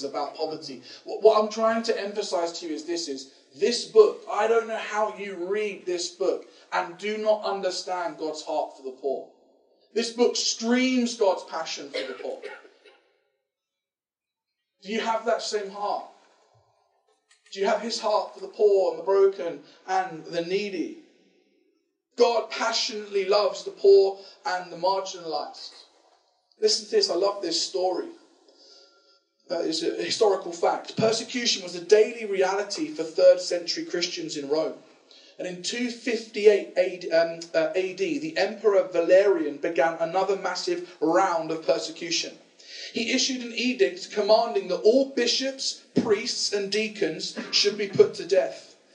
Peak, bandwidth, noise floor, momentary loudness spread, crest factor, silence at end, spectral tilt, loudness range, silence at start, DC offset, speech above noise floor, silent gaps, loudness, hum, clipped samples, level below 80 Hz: -4 dBFS; 10 kHz; under -90 dBFS; 13 LU; 22 dB; 0.3 s; -3 dB/octave; 6 LU; 0 s; under 0.1%; over 65 dB; none; -25 LUFS; none; under 0.1%; under -90 dBFS